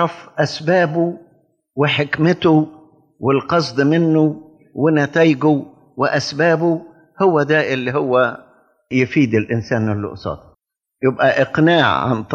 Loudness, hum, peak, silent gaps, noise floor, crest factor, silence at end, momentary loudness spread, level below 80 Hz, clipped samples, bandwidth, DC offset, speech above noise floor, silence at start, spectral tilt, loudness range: -17 LUFS; none; -2 dBFS; none; -61 dBFS; 14 dB; 0 s; 11 LU; -54 dBFS; under 0.1%; 7.6 kHz; under 0.1%; 45 dB; 0 s; -6.5 dB/octave; 3 LU